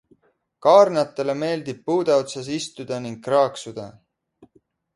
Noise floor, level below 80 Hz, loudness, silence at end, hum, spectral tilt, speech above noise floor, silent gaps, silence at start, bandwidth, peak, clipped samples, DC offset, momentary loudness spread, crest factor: -62 dBFS; -68 dBFS; -21 LUFS; 1.05 s; none; -5 dB/octave; 41 dB; none; 0.65 s; 11.5 kHz; -2 dBFS; under 0.1%; under 0.1%; 17 LU; 22 dB